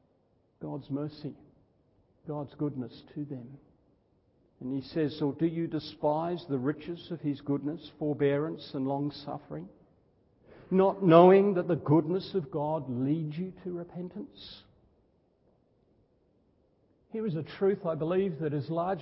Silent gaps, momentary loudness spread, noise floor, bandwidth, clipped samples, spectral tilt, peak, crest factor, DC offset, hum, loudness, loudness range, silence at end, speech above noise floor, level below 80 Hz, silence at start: none; 16 LU; -69 dBFS; 5.8 kHz; under 0.1%; -11.5 dB/octave; -4 dBFS; 26 dB; under 0.1%; none; -30 LUFS; 16 LU; 0 s; 40 dB; -68 dBFS; 0.6 s